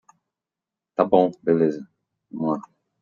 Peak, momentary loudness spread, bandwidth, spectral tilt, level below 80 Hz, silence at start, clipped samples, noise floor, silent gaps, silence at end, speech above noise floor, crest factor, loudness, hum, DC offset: -2 dBFS; 15 LU; 7.2 kHz; -9 dB/octave; -70 dBFS; 1 s; under 0.1%; -88 dBFS; none; 0.4 s; 67 dB; 22 dB; -22 LUFS; none; under 0.1%